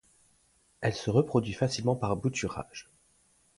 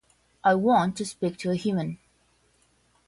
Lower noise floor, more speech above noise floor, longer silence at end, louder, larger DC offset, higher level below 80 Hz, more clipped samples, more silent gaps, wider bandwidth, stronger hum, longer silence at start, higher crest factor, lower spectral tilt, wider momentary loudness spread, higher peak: about the same, -67 dBFS vs -66 dBFS; about the same, 38 dB vs 41 dB; second, 0.75 s vs 1.15 s; second, -30 LUFS vs -26 LUFS; neither; first, -56 dBFS vs -62 dBFS; neither; neither; about the same, 11.5 kHz vs 11.5 kHz; neither; first, 0.8 s vs 0.45 s; about the same, 20 dB vs 18 dB; about the same, -6 dB/octave vs -6 dB/octave; first, 13 LU vs 10 LU; about the same, -12 dBFS vs -10 dBFS